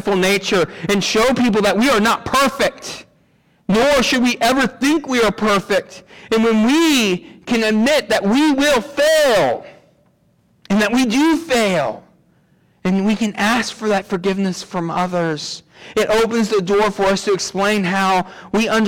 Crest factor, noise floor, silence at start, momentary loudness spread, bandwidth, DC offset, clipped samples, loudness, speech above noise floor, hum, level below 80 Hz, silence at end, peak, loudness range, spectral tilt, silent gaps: 10 dB; -58 dBFS; 0 s; 8 LU; 18.5 kHz; under 0.1%; under 0.1%; -16 LUFS; 42 dB; none; -46 dBFS; 0 s; -8 dBFS; 4 LU; -4 dB/octave; none